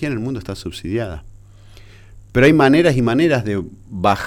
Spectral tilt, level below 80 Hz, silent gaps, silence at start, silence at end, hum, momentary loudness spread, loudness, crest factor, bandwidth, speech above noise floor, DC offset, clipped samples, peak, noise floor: -6.5 dB/octave; -40 dBFS; none; 0 s; 0 s; none; 17 LU; -17 LUFS; 14 dB; 15 kHz; 25 dB; under 0.1%; under 0.1%; -2 dBFS; -42 dBFS